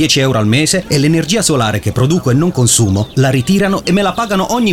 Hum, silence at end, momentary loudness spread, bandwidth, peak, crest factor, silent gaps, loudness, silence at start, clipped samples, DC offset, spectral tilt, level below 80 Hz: none; 0 s; 4 LU; 17 kHz; 0 dBFS; 12 dB; none; -12 LUFS; 0 s; under 0.1%; under 0.1%; -4.5 dB/octave; -38 dBFS